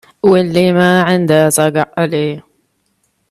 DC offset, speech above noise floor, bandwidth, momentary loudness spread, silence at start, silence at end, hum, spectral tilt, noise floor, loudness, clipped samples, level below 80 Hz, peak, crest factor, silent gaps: under 0.1%; 51 dB; 14 kHz; 7 LU; 0.25 s; 0.9 s; none; -5 dB/octave; -62 dBFS; -12 LUFS; under 0.1%; -54 dBFS; 0 dBFS; 14 dB; none